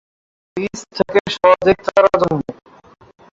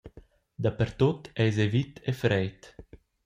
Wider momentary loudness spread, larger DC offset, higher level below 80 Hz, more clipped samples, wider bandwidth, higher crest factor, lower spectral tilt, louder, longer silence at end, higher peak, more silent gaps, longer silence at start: first, 13 LU vs 6 LU; neither; first, -48 dBFS vs -54 dBFS; neither; second, 7.8 kHz vs 14.5 kHz; about the same, 16 dB vs 18 dB; second, -5.5 dB/octave vs -7.5 dB/octave; first, -16 LUFS vs -28 LUFS; first, 0.8 s vs 0.45 s; first, -2 dBFS vs -10 dBFS; first, 1.20-1.25 s vs none; first, 0.55 s vs 0.05 s